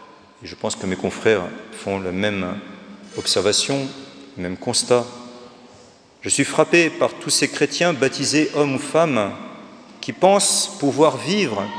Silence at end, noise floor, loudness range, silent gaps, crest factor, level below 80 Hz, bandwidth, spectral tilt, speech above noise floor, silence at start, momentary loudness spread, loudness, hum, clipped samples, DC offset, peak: 0 s; -48 dBFS; 4 LU; none; 20 dB; -62 dBFS; 10.5 kHz; -3 dB/octave; 28 dB; 0 s; 19 LU; -19 LUFS; none; under 0.1%; under 0.1%; 0 dBFS